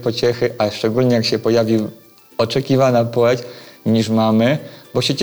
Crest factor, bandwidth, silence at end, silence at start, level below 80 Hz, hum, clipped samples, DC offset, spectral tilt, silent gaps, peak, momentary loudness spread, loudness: 12 dB; over 20 kHz; 0 s; 0 s; -54 dBFS; none; under 0.1%; under 0.1%; -6 dB/octave; none; -6 dBFS; 9 LU; -17 LUFS